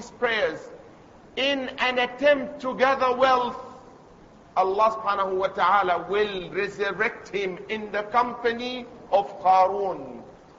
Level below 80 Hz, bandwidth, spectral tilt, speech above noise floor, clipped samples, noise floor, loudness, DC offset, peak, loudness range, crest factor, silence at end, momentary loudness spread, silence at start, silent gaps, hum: -60 dBFS; 7.8 kHz; -4.5 dB/octave; 26 dB; under 0.1%; -50 dBFS; -24 LUFS; under 0.1%; -8 dBFS; 2 LU; 18 dB; 0.25 s; 12 LU; 0 s; none; none